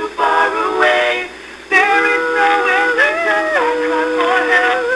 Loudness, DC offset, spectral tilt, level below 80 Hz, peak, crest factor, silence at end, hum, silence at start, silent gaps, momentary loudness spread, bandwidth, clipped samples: -13 LUFS; under 0.1%; -2 dB/octave; -52 dBFS; -2 dBFS; 14 dB; 0 s; none; 0 s; none; 4 LU; 11 kHz; under 0.1%